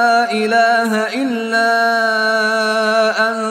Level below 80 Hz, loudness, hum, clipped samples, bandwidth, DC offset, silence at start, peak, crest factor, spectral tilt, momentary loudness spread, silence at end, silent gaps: -68 dBFS; -14 LUFS; none; under 0.1%; 15.5 kHz; under 0.1%; 0 s; -2 dBFS; 12 dB; -3 dB/octave; 4 LU; 0 s; none